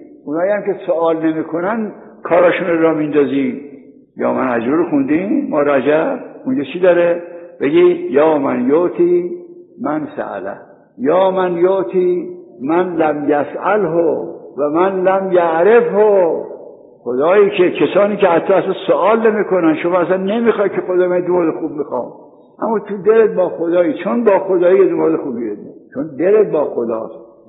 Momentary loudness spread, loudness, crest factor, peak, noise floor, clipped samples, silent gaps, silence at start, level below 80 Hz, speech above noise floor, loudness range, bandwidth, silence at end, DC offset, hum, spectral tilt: 12 LU; -15 LUFS; 14 dB; 0 dBFS; -37 dBFS; under 0.1%; none; 0 s; -64 dBFS; 23 dB; 3 LU; 4 kHz; 0.25 s; under 0.1%; none; -5.5 dB/octave